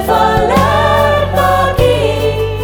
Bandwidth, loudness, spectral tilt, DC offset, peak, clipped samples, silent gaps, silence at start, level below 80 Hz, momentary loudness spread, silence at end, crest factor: 20 kHz; -11 LUFS; -5.5 dB/octave; under 0.1%; 0 dBFS; under 0.1%; none; 0 s; -24 dBFS; 3 LU; 0 s; 10 dB